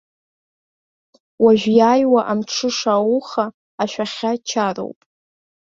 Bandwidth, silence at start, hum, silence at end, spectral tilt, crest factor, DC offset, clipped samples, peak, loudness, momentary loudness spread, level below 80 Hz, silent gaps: 7.6 kHz; 1.4 s; none; 0.85 s; -4.5 dB/octave; 18 dB; under 0.1%; under 0.1%; -2 dBFS; -18 LUFS; 12 LU; -62 dBFS; 3.54-3.78 s